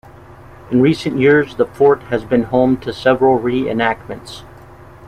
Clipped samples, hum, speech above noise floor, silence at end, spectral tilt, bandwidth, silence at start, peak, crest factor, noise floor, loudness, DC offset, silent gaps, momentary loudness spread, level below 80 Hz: under 0.1%; none; 24 dB; 0 s; -7 dB/octave; 11.5 kHz; 0.65 s; -2 dBFS; 14 dB; -39 dBFS; -15 LUFS; under 0.1%; none; 13 LU; -44 dBFS